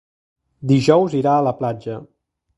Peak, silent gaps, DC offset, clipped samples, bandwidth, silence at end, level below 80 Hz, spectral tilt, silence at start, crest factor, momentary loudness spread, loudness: 0 dBFS; none; under 0.1%; under 0.1%; 11 kHz; 0.55 s; -58 dBFS; -7.5 dB/octave; 0.6 s; 20 dB; 16 LU; -17 LUFS